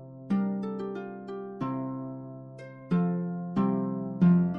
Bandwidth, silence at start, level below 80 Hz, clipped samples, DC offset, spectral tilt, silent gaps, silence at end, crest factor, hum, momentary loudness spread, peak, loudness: 4.6 kHz; 0 s; -66 dBFS; under 0.1%; under 0.1%; -11 dB/octave; none; 0 s; 16 dB; none; 16 LU; -12 dBFS; -30 LUFS